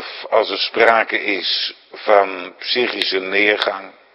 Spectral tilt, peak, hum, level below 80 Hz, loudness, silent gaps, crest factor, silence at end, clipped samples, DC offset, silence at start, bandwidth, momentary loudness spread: -3.5 dB/octave; 0 dBFS; none; -70 dBFS; -17 LUFS; none; 18 dB; 0.25 s; under 0.1%; under 0.1%; 0 s; 11 kHz; 10 LU